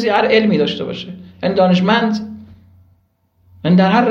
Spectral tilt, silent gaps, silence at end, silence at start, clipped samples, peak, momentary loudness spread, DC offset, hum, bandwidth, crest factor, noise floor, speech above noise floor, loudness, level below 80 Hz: -7.5 dB/octave; none; 0 s; 0 s; under 0.1%; 0 dBFS; 14 LU; under 0.1%; none; 7 kHz; 16 dB; -59 dBFS; 46 dB; -15 LUFS; -56 dBFS